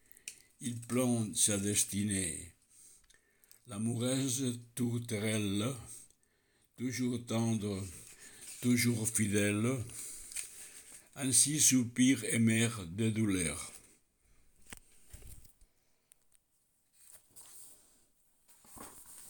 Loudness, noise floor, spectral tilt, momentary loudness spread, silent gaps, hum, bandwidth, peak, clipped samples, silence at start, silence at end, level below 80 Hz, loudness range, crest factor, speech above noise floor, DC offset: -32 LUFS; -75 dBFS; -4 dB/octave; 23 LU; none; none; over 20 kHz; -12 dBFS; under 0.1%; 0.25 s; 0 s; -68 dBFS; 8 LU; 24 dB; 43 dB; under 0.1%